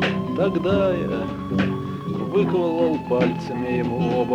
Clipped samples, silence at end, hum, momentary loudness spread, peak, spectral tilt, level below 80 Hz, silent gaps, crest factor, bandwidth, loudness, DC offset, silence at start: under 0.1%; 0 s; none; 7 LU; -6 dBFS; -8 dB/octave; -48 dBFS; none; 14 dB; 9.6 kHz; -22 LUFS; under 0.1%; 0 s